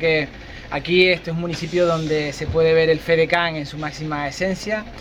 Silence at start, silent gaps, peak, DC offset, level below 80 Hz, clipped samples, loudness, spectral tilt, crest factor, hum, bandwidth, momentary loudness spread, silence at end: 0 s; none; -2 dBFS; under 0.1%; -42 dBFS; under 0.1%; -20 LUFS; -5.5 dB/octave; 18 dB; none; 12.5 kHz; 12 LU; 0 s